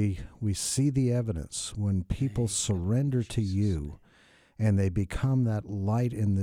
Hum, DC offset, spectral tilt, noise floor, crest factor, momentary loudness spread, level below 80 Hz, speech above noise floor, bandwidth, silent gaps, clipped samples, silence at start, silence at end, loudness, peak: none; under 0.1%; -6 dB/octave; -60 dBFS; 14 dB; 6 LU; -44 dBFS; 33 dB; 15 kHz; none; under 0.1%; 0 s; 0 s; -29 LUFS; -14 dBFS